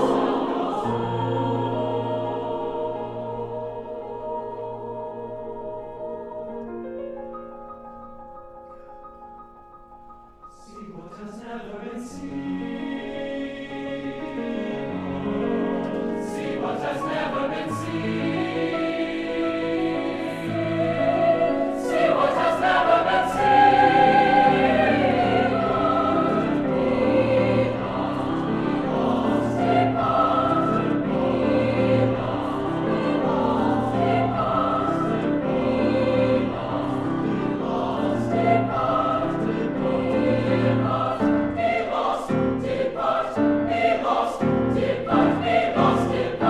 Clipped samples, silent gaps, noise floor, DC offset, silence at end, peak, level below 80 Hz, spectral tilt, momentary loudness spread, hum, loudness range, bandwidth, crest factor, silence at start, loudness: under 0.1%; none; -46 dBFS; under 0.1%; 0 s; -6 dBFS; -48 dBFS; -7 dB/octave; 14 LU; none; 17 LU; 12 kHz; 18 dB; 0 s; -23 LUFS